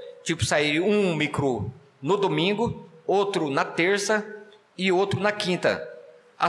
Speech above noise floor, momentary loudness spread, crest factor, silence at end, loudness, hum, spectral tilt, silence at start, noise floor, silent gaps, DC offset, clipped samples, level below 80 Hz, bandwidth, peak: 23 dB; 11 LU; 16 dB; 0 s; -24 LUFS; none; -4.5 dB/octave; 0 s; -47 dBFS; none; under 0.1%; under 0.1%; -56 dBFS; 12.5 kHz; -10 dBFS